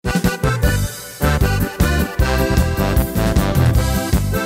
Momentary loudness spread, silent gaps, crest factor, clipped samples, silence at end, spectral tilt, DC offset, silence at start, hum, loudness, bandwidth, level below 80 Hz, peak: 3 LU; none; 14 dB; under 0.1%; 0 s; -5.5 dB/octave; under 0.1%; 0.05 s; none; -18 LUFS; 16.5 kHz; -22 dBFS; -2 dBFS